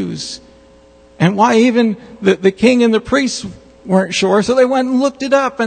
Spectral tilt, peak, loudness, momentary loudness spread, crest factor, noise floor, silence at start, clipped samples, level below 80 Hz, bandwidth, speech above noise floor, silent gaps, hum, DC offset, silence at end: -5.5 dB/octave; 0 dBFS; -14 LUFS; 12 LU; 14 dB; -45 dBFS; 0 s; under 0.1%; -48 dBFS; 9.4 kHz; 31 dB; none; none; under 0.1%; 0 s